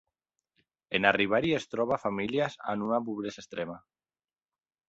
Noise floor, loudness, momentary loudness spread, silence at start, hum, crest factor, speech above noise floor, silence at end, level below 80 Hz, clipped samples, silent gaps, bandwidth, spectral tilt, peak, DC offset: under -90 dBFS; -30 LUFS; 13 LU; 0.9 s; none; 26 dB; over 60 dB; 1.1 s; -66 dBFS; under 0.1%; none; 8 kHz; -5.5 dB/octave; -6 dBFS; under 0.1%